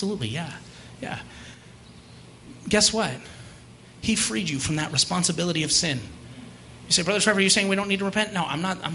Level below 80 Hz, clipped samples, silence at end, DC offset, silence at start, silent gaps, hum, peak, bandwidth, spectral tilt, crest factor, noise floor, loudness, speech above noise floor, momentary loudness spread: -52 dBFS; under 0.1%; 0 s; under 0.1%; 0 s; none; none; -4 dBFS; 11.5 kHz; -3 dB/octave; 22 dB; -47 dBFS; -23 LUFS; 23 dB; 23 LU